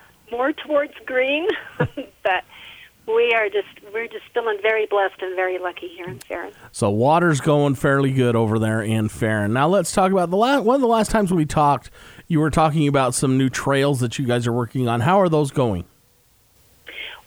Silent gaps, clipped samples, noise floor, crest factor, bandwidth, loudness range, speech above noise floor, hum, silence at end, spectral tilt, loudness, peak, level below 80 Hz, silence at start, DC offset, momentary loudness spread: none; under 0.1%; -58 dBFS; 16 dB; over 20 kHz; 4 LU; 38 dB; none; 0.1 s; -6 dB/octave; -20 LUFS; -4 dBFS; -46 dBFS; 0.3 s; under 0.1%; 13 LU